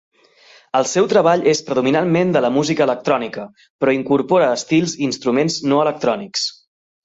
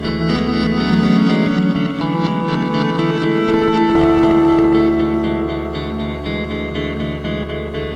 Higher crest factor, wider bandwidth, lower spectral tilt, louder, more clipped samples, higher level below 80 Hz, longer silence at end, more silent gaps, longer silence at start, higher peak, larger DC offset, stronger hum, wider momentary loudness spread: about the same, 16 dB vs 14 dB; about the same, 8 kHz vs 8.8 kHz; second, -5 dB/octave vs -7.5 dB/octave; about the same, -17 LUFS vs -16 LUFS; neither; second, -60 dBFS vs -34 dBFS; first, 0.55 s vs 0 s; first, 3.70-3.79 s vs none; first, 0.75 s vs 0 s; about the same, -2 dBFS vs -2 dBFS; neither; neither; second, 7 LU vs 10 LU